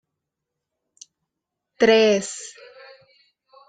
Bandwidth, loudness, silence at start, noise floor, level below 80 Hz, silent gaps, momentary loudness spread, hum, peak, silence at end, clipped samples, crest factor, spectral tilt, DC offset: 9.4 kHz; -18 LUFS; 1.8 s; -83 dBFS; -66 dBFS; none; 20 LU; none; -6 dBFS; 1.2 s; under 0.1%; 20 dB; -3.5 dB/octave; under 0.1%